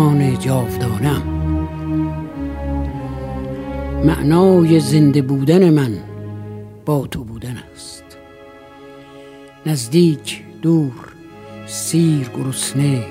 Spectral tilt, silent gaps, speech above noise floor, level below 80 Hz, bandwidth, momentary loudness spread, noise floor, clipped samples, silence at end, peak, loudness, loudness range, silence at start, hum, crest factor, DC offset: -6.5 dB/octave; none; 25 dB; -34 dBFS; 16 kHz; 19 LU; -40 dBFS; under 0.1%; 0 s; -2 dBFS; -17 LUFS; 12 LU; 0 s; none; 16 dB; under 0.1%